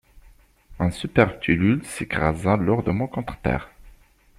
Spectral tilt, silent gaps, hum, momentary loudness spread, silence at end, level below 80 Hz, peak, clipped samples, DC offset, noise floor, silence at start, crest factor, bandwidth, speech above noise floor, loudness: -7 dB/octave; none; none; 8 LU; 0.5 s; -42 dBFS; -2 dBFS; under 0.1%; under 0.1%; -53 dBFS; 0.15 s; 22 dB; 14.5 kHz; 31 dB; -23 LUFS